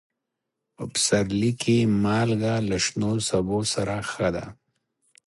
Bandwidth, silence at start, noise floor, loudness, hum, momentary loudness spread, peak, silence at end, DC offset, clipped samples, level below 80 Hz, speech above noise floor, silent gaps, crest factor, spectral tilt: 11.5 kHz; 0.8 s; -83 dBFS; -24 LUFS; none; 7 LU; -8 dBFS; 0.75 s; under 0.1%; under 0.1%; -50 dBFS; 59 dB; none; 18 dB; -4.5 dB/octave